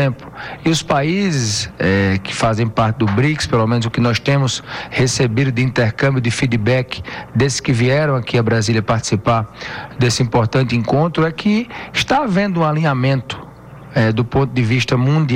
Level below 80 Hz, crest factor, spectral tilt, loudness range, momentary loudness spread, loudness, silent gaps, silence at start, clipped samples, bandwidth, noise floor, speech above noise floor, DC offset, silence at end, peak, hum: -42 dBFS; 10 dB; -5.5 dB/octave; 1 LU; 6 LU; -17 LUFS; none; 0 s; under 0.1%; 11.5 kHz; -36 dBFS; 20 dB; under 0.1%; 0 s; -6 dBFS; none